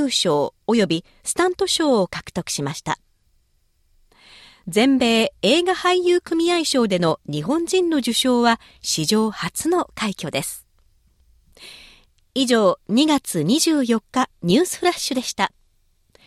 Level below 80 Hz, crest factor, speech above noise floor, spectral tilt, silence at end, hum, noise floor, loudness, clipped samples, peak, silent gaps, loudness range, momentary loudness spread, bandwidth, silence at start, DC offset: -56 dBFS; 16 dB; 43 dB; -4 dB/octave; 0.8 s; none; -63 dBFS; -20 LUFS; under 0.1%; -4 dBFS; none; 6 LU; 9 LU; 15.5 kHz; 0 s; under 0.1%